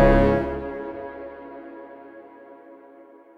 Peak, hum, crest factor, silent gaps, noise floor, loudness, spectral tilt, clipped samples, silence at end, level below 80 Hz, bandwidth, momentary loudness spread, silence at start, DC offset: -4 dBFS; none; 20 dB; none; -49 dBFS; -24 LUFS; -9 dB/octave; under 0.1%; 0.65 s; -32 dBFS; 6 kHz; 26 LU; 0 s; under 0.1%